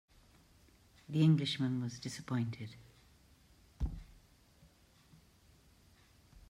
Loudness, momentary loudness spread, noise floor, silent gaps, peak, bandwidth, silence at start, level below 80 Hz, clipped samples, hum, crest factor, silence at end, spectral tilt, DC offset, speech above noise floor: -36 LUFS; 20 LU; -65 dBFS; none; -20 dBFS; 12 kHz; 1.1 s; -54 dBFS; under 0.1%; none; 20 dB; 0.1 s; -6.5 dB/octave; under 0.1%; 31 dB